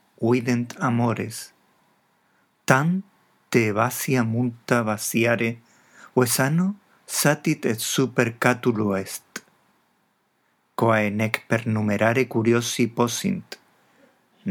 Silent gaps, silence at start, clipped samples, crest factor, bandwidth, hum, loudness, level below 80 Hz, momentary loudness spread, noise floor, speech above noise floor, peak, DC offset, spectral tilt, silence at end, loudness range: none; 0.2 s; under 0.1%; 24 dB; 19.5 kHz; none; -23 LUFS; -74 dBFS; 14 LU; -68 dBFS; 46 dB; 0 dBFS; under 0.1%; -5 dB/octave; 0 s; 3 LU